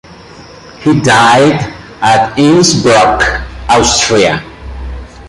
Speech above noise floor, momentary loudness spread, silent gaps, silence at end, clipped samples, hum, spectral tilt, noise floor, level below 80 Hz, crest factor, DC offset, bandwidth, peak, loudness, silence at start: 25 dB; 18 LU; none; 0 s; under 0.1%; none; -4 dB/octave; -33 dBFS; -28 dBFS; 10 dB; under 0.1%; 11.5 kHz; 0 dBFS; -9 LUFS; 0.1 s